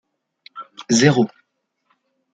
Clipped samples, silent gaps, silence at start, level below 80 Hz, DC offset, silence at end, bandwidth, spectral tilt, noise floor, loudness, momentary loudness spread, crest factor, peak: under 0.1%; none; 0.55 s; -62 dBFS; under 0.1%; 1.1 s; 9.4 kHz; -4.5 dB/octave; -72 dBFS; -17 LUFS; 24 LU; 20 dB; -2 dBFS